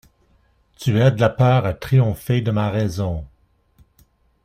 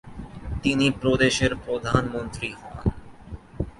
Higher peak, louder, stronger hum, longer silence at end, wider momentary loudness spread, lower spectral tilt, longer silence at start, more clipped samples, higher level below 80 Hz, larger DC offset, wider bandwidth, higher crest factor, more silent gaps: about the same, -2 dBFS vs -4 dBFS; first, -19 LUFS vs -24 LUFS; neither; first, 1.2 s vs 0.05 s; second, 10 LU vs 20 LU; first, -7.5 dB/octave vs -5 dB/octave; first, 0.8 s vs 0.05 s; neither; second, -44 dBFS vs -38 dBFS; neither; first, 15.5 kHz vs 11.5 kHz; about the same, 18 dB vs 22 dB; neither